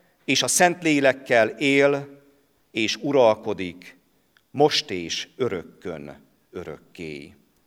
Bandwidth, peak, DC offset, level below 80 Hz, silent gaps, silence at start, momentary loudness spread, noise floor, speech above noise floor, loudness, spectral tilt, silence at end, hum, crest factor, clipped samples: 17 kHz; -4 dBFS; under 0.1%; -64 dBFS; none; 0.3 s; 19 LU; -64 dBFS; 41 dB; -21 LUFS; -3 dB/octave; 0.4 s; none; 20 dB; under 0.1%